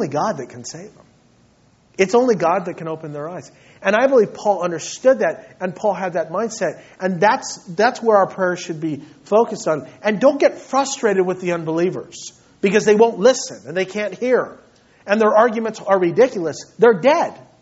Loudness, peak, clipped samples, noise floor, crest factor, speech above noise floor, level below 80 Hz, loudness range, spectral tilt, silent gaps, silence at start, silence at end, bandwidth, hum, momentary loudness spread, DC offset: -18 LUFS; 0 dBFS; under 0.1%; -55 dBFS; 18 dB; 37 dB; -64 dBFS; 3 LU; -4 dB/octave; none; 0 s; 0.25 s; 8 kHz; none; 14 LU; under 0.1%